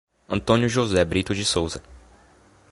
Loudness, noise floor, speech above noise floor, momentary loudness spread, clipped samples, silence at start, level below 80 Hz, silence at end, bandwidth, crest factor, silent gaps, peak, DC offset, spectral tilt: -22 LUFS; -55 dBFS; 33 dB; 10 LU; under 0.1%; 0.3 s; -42 dBFS; 0.75 s; 11.5 kHz; 22 dB; none; -2 dBFS; under 0.1%; -4.5 dB/octave